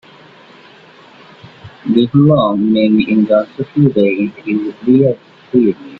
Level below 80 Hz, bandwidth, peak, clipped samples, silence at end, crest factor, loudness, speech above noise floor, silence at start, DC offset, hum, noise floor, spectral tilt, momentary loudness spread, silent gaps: -52 dBFS; 5.2 kHz; 0 dBFS; under 0.1%; 0 s; 14 dB; -13 LUFS; 29 dB; 1.45 s; under 0.1%; none; -41 dBFS; -10 dB/octave; 9 LU; none